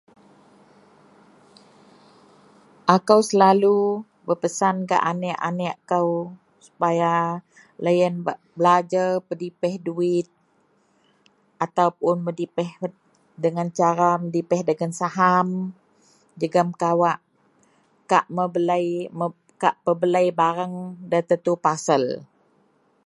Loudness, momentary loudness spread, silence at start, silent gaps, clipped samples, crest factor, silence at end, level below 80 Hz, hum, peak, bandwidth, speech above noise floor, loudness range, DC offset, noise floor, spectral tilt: -22 LUFS; 11 LU; 2.85 s; none; under 0.1%; 22 dB; 0.8 s; -74 dBFS; none; 0 dBFS; 11.5 kHz; 42 dB; 6 LU; under 0.1%; -63 dBFS; -6 dB/octave